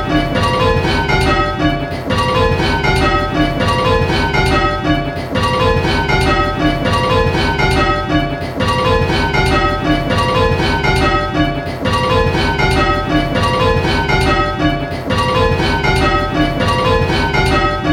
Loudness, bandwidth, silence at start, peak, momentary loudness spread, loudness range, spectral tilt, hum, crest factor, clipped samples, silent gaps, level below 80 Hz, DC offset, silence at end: -14 LUFS; 17 kHz; 0 s; 0 dBFS; 4 LU; 0 LU; -5.5 dB/octave; none; 14 dB; under 0.1%; none; -24 dBFS; under 0.1%; 0 s